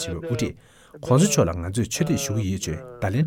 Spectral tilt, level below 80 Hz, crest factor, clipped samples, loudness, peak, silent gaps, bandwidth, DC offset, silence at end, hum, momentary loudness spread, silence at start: -5.5 dB/octave; -44 dBFS; 16 dB; under 0.1%; -24 LUFS; -6 dBFS; none; 17 kHz; under 0.1%; 0 s; none; 11 LU; 0 s